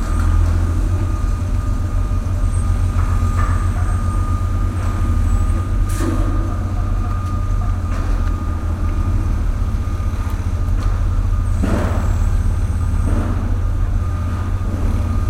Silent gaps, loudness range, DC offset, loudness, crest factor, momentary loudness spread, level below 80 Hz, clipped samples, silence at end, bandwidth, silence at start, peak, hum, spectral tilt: none; 2 LU; under 0.1%; -20 LUFS; 12 dB; 3 LU; -20 dBFS; under 0.1%; 0 s; 12.5 kHz; 0 s; -4 dBFS; none; -7.5 dB/octave